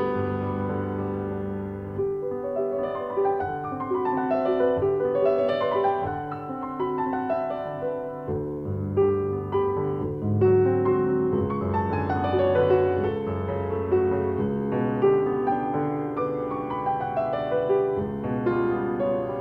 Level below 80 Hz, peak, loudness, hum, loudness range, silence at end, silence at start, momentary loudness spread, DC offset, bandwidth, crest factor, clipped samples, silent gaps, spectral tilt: -52 dBFS; -10 dBFS; -25 LUFS; none; 5 LU; 0 s; 0 s; 8 LU; under 0.1%; 4.9 kHz; 16 dB; under 0.1%; none; -10 dB/octave